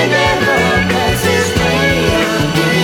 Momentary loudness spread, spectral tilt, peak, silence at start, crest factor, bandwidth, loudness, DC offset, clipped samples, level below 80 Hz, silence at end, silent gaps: 2 LU; -4.5 dB/octave; 0 dBFS; 0 s; 12 dB; 18.5 kHz; -12 LUFS; under 0.1%; under 0.1%; -30 dBFS; 0 s; none